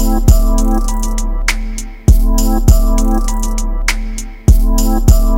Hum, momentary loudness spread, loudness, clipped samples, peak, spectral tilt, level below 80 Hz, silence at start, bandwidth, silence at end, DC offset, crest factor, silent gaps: none; 8 LU; -15 LUFS; 1%; 0 dBFS; -5.5 dB/octave; -12 dBFS; 0 s; 16.5 kHz; 0 s; under 0.1%; 10 dB; none